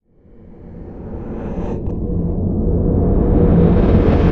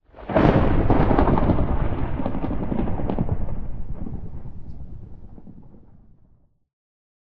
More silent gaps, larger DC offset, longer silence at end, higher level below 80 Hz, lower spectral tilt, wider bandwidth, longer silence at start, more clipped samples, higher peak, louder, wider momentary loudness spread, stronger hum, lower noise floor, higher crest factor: neither; neither; second, 0 s vs 0.5 s; first, -22 dBFS vs -28 dBFS; about the same, -11 dB/octave vs -10.5 dB/octave; about the same, 5 kHz vs 4.9 kHz; first, 0.45 s vs 0 s; neither; about the same, -2 dBFS vs 0 dBFS; first, -16 LUFS vs -23 LUFS; second, 19 LU vs 22 LU; neither; second, -43 dBFS vs -57 dBFS; second, 14 dB vs 22 dB